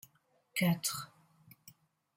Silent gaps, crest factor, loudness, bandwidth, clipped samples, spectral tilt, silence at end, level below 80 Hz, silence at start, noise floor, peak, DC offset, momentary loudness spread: none; 20 dB; -34 LUFS; 16.5 kHz; under 0.1%; -4 dB/octave; 0.45 s; -76 dBFS; 0.55 s; -72 dBFS; -20 dBFS; under 0.1%; 21 LU